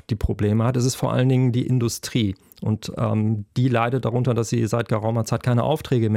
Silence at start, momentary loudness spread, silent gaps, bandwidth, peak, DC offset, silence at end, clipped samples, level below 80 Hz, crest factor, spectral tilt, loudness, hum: 0.1 s; 5 LU; none; 16 kHz; -6 dBFS; under 0.1%; 0 s; under 0.1%; -42 dBFS; 14 dB; -6.5 dB/octave; -22 LUFS; none